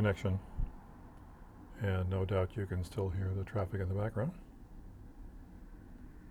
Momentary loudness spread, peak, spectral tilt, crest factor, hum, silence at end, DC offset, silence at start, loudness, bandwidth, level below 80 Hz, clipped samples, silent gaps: 21 LU; -18 dBFS; -8 dB/octave; 18 dB; none; 0 s; under 0.1%; 0 s; -37 LUFS; 11.5 kHz; -48 dBFS; under 0.1%; none